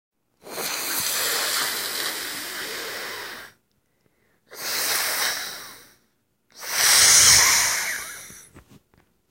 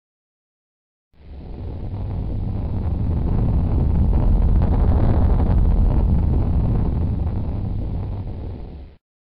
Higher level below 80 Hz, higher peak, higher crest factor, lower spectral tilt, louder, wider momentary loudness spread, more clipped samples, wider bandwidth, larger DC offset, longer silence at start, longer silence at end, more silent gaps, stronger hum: second, -56 dBFS vs -22 dBFS; first, 0 dBFS vs -8 dBFS; first, 24 dB vs 12 dB; second, 1.5 dB/octave vs -11 dB/octave; about the same, -19 LUFS vs -21 LUFS; first, 24 LU vs 14 LU; neither; first, 16 kHz vs 4.5 kHz; neither; second, 0.45 s vs 1.25 s; first, 0.7 s vs 0.4 s; neither; neither